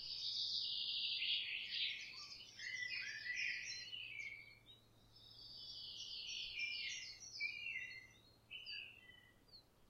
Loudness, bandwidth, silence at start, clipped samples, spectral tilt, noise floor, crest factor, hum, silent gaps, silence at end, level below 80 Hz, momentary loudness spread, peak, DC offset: -44 LUFS; 16 kHz; 0 s; under 0.1%; 1 dB/octave; -67 dBFS; 18 dB; none; none; 0 s; -78 dBFS; 21 LU; -30 dBFS; under 0.1%